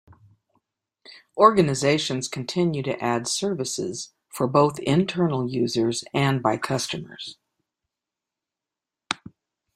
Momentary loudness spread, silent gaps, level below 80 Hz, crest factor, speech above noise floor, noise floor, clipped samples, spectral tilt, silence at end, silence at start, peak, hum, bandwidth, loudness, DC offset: 13 LU; none; -62 dBFS; 24 dB; 65 dB; -88 dBFS; under 0.1%; -5 dB/octave; 0.6 s; 1.1 s; -2 dBFS; none; 15.5 kHz; -23 LUFS; under 0.1%